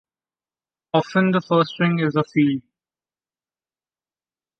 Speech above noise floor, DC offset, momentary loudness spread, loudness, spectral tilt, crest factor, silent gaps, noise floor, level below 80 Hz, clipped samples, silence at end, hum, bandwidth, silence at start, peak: over 71 dB; under 0.1%; 4 LU; -20 LUFS; -7.5 dB/octave; 20 dB; none; under -90 dBFS; -68 dBFS; under 0.1%; 2 s; none; 6.6 kHz; 0.95 s; -4 dBFS